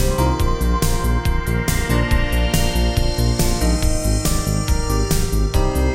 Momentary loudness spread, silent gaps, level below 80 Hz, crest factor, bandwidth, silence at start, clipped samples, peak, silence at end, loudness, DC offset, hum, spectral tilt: 2 LU; none; -20 dBFS; 14 dB; 16.5 kHz; 0 s; under 0.1%; -4 dBFS; 0 s; -19 LUFS; under 0.1%; none; -5 dB/octave